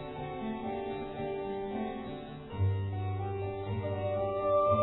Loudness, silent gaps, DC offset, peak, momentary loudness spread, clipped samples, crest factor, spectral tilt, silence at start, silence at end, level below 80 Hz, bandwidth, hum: -35 LUFS; none; under 0.1%; -16 dBFS; 9 LU; under 0.1%; 18 dB; -11 dB/octave; 0 s; 0 s; -56 dBFS; 4.1 kHz; none